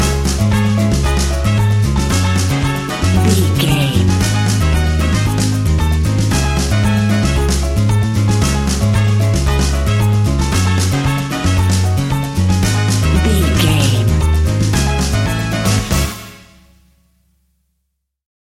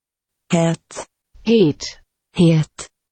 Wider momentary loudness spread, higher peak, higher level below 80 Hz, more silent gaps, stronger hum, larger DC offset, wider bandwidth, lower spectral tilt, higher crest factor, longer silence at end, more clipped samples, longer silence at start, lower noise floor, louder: second, 3 LU vs 19 LU; first, 0 dBFS vs -4 dBFS; first, -20 dBFS vs -52 dBFS; neither; neither; neither; first, 16 kHz vs 8.8 kHz; about the same, -5.5 dB/octave vs -6.5 dB/octave; about the same, 14 dB vs 16 dB; first, 2.05 s vs 0.25 s; neither; second, 0 s vs 0.5 s; second, -71 dBFS vs -80 dBFS; first, -14 LUFS vs -18 LUFS